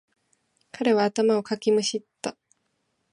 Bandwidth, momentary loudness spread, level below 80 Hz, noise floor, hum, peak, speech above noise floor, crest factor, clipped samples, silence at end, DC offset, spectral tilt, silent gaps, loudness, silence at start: 11.5 kHz; 13 LU; -76 dBFS; -74 dBFS; none; -8 dBFS; 51 dB; 18 dB; under 0.1%; 0.8 s; under 0.1%; -4 dB/octave; none; -25 LUFS; 0.75 s